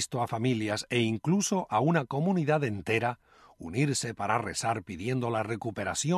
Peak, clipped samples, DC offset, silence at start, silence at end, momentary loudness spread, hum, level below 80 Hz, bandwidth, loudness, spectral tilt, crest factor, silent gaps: -12 dBFS; under 0.1%; under 0.1%; 0 s; 0 s; 7 LU; none; -60 dBFS; 14 kHz; -29 LUFS; -5 dB/octave; 18 dB; none